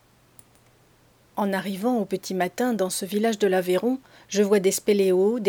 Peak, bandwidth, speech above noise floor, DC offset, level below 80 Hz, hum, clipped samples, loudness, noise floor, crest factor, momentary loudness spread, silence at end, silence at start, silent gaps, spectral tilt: -8 dBFS; over 20 kHz; 35 dB; under 0.1%; -68 dBFS; none; under 0.1%; -24 LUFS; -58 dBFS; 16 dB; 8 LU; 0 s; 1.35 s; none; -4.5 dB/octave